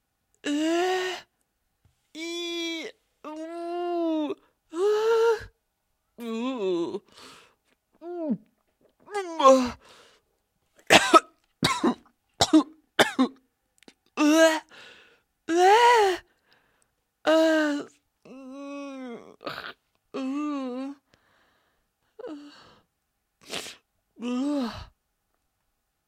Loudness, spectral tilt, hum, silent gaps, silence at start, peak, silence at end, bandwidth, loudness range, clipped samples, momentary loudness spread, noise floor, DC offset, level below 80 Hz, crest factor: -24 LUFS; -3 dB/octave; none; none; 0.45 s; 0 dBFS; 1.25 s; 16 kHz; 14 LU; under 0.1%; 22 LU; -78 dBFS; under 0.1%; -62 dBFS; 26 dB